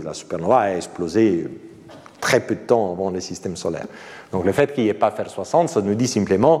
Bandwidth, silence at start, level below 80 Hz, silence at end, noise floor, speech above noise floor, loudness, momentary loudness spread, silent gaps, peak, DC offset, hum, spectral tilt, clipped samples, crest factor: 15 kHz; 0 s; -56 dBFS; 0 s; -43 dBFS; 23 dB; -21 LUFS; 11 LU; none; -2 dBFS; under 0.1%; none; -5.5 dB/octave; under 0.1%; 18 dB